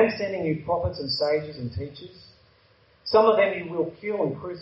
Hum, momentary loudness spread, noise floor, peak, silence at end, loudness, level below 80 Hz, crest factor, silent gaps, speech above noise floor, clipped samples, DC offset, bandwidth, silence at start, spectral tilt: none; 17 LU; -60 dBFS; -6 dBFS; 0 s; -25 LUFS; -52 dBFS; 20 dB; none; 34 dB; under 0.1%; under 0.1%; 7.6 kHz; 0 s; -4 dB/octave